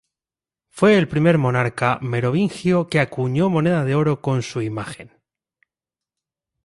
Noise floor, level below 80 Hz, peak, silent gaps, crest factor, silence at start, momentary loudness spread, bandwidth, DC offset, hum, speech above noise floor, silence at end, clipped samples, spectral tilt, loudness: under -90 dBFS; -54 dBFS; -4 dBFS; none; 16 dB; 0.75 s; 10 LU; 11.5 kHz; under 0.1%; none; over 71 dB; 1.6 s; under 0.1%; -7 dB/octave; -19 LUFS